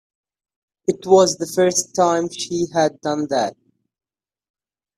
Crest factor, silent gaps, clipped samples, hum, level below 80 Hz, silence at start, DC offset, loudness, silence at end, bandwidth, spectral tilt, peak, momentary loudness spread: 20 dB; none; under 0.1%; none; -62 dBFS; 0.9 s; under 0.1%; -19 LUFS; 1.45 s; 14.5 kHz; -4 dB/octave; -2 dBFS; 10 LU